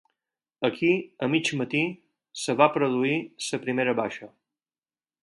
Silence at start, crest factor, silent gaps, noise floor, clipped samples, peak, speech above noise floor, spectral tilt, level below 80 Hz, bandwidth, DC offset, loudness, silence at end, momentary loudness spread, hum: 0.6 s; 22 dB; none; under -90 dBFS; under 0.1%; -4 dBFS; over 65 dB; -5 dB/octave; -74 dBFS; 11.5 kHz; under 0.1%; -26 LUFS; 0.95 s; 10 LU; none